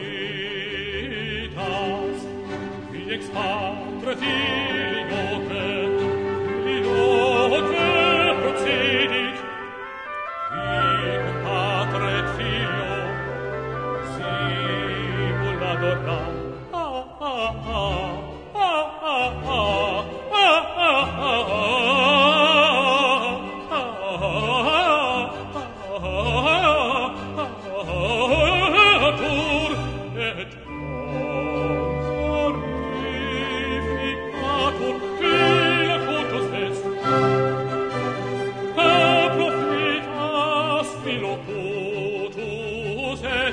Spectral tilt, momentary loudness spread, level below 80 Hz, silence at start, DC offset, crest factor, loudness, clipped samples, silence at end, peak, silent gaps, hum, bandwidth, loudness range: -5 dB/octave; 13 LU; -42 dBFS; 0 s; under 0.1%; 20 dB; -22 LUFS; under 0.1%; 0 s; -2 dBFS; none; none; 10 kHz; 7 LU